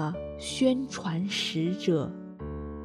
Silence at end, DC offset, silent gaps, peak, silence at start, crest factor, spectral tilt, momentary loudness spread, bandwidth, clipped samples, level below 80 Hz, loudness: 0 s; under 0.1%; none; -12 dBFS; 0 s; 18 dB; -5 dB/octave; 12 LU; 13.5 kHz; under 0.1%; -50 dBFS; -30 LUFS